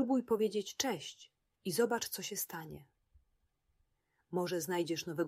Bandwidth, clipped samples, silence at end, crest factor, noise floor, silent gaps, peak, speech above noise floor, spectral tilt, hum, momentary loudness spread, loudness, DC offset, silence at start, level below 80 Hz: 16 kHz; under 0.1%; 0 s; 20 dB; -79 dBFS; none; -18 dBFS; 43 dB; -4 dB/octave; none; 14 LU; -36 LUFS; under 0.1%; 0 s; -74 dBFS